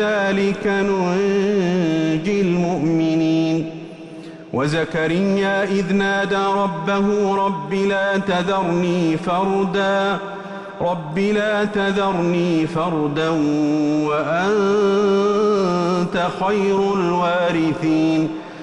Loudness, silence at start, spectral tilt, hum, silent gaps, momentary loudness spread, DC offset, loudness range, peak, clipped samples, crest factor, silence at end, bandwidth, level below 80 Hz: -19 LUFS; 0 s; -6.5 dB/octave; none; none; 5 LU; under 0.1%; 2 LU; -8 dBFS; under 0.1%; 10 dB; 0 s; 10.5 kHz; -52 dBFS